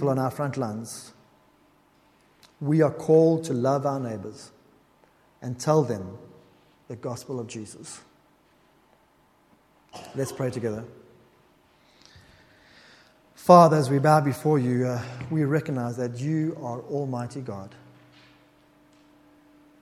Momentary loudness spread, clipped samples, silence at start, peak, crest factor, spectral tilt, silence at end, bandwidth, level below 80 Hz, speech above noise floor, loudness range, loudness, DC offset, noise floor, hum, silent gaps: 22 LU; under 0.1%; 0 s; -2 dBFS; 26 dB; -7 dB/octave; 2.15 s; 16 kHz; -64 dBFS; 38 dB; 16 LU; -24 LUFS; under 0.1%; -62 dBFS; none; none